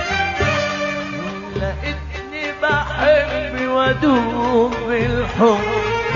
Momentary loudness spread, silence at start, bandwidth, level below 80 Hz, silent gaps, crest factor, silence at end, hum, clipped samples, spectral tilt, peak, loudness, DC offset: 10 LU; 0 s; 7.4 kHz; -34 dBFS; none; 16 dB; 0 s; none; under 0.1%; -5.5 dB/octave; -2 dBFS; -19 LUFS; under 0.1%